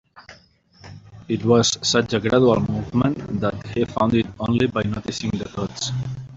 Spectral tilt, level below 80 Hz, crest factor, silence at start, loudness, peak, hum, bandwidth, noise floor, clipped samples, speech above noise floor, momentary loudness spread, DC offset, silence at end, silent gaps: -5 dB/octave; -48 dBFS; 18 dB; 0.15 s; -21 LUFS; -4 dBFS; none; 7.8 kHz; -53 dBFS; under 0.1%; 32 dB; 10 LU; under 0.1%; 0 s; none